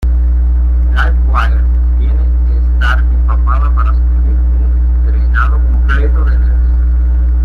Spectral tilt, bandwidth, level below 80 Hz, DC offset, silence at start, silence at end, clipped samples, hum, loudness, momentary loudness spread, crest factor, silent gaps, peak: -8 dB/octave; 3.4 kHz; -10 dBFS; under 0.1%; 0 s; 0 s; under 0.1%; none; -12 LUFS; 1 LU; 8 dB; none; -2 dBFS